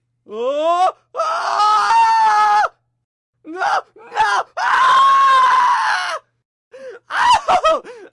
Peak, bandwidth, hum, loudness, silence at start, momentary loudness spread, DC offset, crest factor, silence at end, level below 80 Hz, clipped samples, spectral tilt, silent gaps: -4 dBFS; 11.5 kHz; none; -15 LUFS; 0.3 s; 12 LU; under 0.1%; 12 dB; 0.05 s; -54 dBFS; under 0.1%; -1 dB/octave; 3.04-3.33 s, 6.45-6.71 s